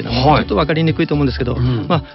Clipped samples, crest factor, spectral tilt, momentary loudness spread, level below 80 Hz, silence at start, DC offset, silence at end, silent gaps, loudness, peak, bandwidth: under 0.1%; 14 dB; -5.5 dB/octave; 5 LU; -28 dBFS; 0 s; under 0.1%; 0 s; none; -16 LUFS; 0 dBFS; 6 kHz